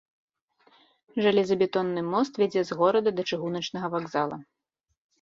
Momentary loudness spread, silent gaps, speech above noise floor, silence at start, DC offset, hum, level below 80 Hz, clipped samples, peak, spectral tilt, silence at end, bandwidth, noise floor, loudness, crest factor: 8 LU; none; 55 dB; 1.15 s; under 0.1%; none; -70 dBFS; under 0.1%; -8 dBFS; -6 dB/octave; 0.8 s; 7.6 kHz; -80 dBFS; -26 LUFS; 18 dB